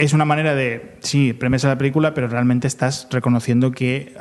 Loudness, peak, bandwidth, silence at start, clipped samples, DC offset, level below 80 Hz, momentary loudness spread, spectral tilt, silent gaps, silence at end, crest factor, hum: -19 LUFS; -2 dBFS; 12 kHz; 0 s; under 0.1%; under 0.1%; -50 dBFS; 5 LU; -6 dB/octave; none; 0 s; 16 dB; none